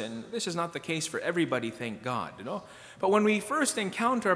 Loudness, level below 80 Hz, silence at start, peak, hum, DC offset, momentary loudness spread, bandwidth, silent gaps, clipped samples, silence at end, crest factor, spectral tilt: -30 LUFS; -70 dBFS; 0 s; -12 dBFS; none; under 0.1%; 12 LU; 11 kHz; none; under 0.1%; 0 s; 18 dB; -4 dB/octave